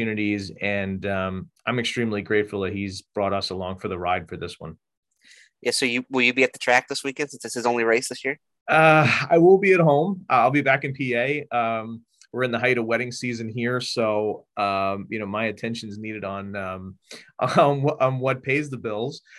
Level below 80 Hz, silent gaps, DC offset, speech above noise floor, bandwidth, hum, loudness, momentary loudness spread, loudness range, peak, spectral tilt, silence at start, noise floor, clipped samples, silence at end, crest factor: -54 dBFS; 4.97-5.03 s, 8.61-8.66 s; under 0.1%; 32 dB; 12.5 kHz; none; -23 LUFS; 14 LU; 9 LU; -2 dBFS; -5 dB/octave; 0 s; -55 dBFS; under 0.1%; 0 s; 20 dB